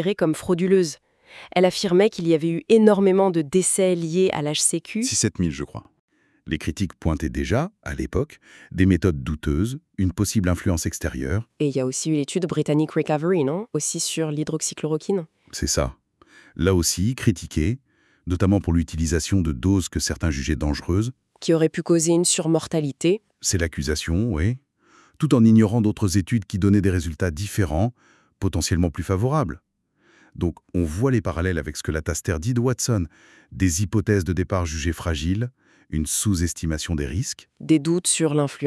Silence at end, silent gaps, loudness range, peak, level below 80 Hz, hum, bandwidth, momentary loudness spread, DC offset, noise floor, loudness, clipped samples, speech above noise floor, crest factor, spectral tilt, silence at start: 0 s; 5.99-6.08 s; 6 LU; -2 dBFS; -40 dBFS; none; 12 kHz; 9 LU; under 0.1%; -61 dBFS; -22 LUFS; under 0.1%; 40 dB; 20 dB; -5 dB/octave; 0 s